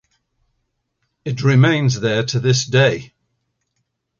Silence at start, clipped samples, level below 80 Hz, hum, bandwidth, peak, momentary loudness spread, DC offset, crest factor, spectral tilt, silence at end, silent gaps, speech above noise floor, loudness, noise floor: 1.25 s; under 0.1%; -54 dBFS; none; 7.4 kHz; -2 dBFS; 14 LU; under 0.1%; 16 dB; -5.5 dB/octave; 1.15 s; none; 57 dB; -16 LUFS; -72 dBFS